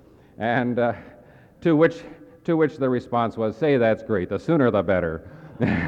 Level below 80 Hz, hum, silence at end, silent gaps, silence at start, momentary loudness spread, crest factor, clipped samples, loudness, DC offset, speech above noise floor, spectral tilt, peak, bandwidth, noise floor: -56 dBFS; none; 0 s; none; 0.4 s; 11 LU; 18 dB; under 0.1%; -22 LUFS; under 0.1%; 28 dB; -8.5 dB/octave; -6 dBFS; 8 kHz; -50 dBFS